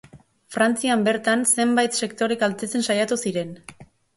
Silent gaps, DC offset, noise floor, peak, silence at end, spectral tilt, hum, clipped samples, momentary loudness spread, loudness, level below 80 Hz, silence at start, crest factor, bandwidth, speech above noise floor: none; under 0.1%; -48 dBFS; -6 dBFS; 0.3 s; -3 dB/octave; none; under 0.1%; 10 LU; -21 LUFS; -64 dBFS; 0.15 s; 16 dB; 12 kHz; 26 dB